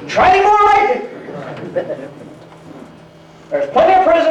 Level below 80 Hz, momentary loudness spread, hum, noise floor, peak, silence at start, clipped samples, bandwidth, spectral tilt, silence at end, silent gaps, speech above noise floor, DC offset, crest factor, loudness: -46 dBFS; 19 LU; none; -40 dBFS; -4 dBFS; 0 s; under 0.1%; 9.4 kHz; -5 dB/octave; 0 s; none; 29 dB; under 0.1%; 12 dB; -13 LUFS